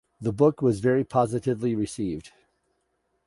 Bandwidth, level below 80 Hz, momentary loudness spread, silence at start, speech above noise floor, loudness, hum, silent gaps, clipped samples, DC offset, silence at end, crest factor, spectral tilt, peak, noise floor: 11.5 kHz; -56 dBFS; 10 LU; 0.2 s; 50 dB; -25 LUFS; none; none; under 0.1%; under 0.1%; 1 s; 20 dB; -7.5 dB/octave; -6 dBFS; -74 dBFS